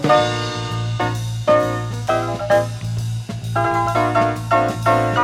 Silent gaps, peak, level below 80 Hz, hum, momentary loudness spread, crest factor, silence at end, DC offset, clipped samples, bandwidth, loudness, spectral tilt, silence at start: none; -2 dBFS; -42 dBFS; none; 8 LU; 16 dB; 0 s; under 0.1%; under 0.1%; 15 kHz; -19 LUFS; -6 dB/octave; 0 s